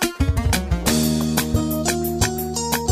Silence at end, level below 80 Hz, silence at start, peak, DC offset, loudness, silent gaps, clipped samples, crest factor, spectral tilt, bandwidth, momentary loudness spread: 0 s; -28 dBFS; 0 s; -4 dBFS; under 0.1%; -21 LUFS; none; under 0.1%; 16 dB; -4.5 dB/octave; 15.5 kHz; 3 LU